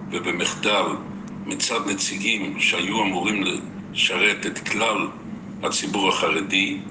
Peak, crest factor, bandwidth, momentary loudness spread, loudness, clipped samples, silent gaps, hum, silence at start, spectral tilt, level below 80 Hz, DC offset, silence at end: -6 dBFS; 18 dB; 10 kHz; 11 LU; -22 LUFS; under 0.1%; none; none; 0 s; -2.5 dB/octave; -60 dBFS; under 0.1%; 0 s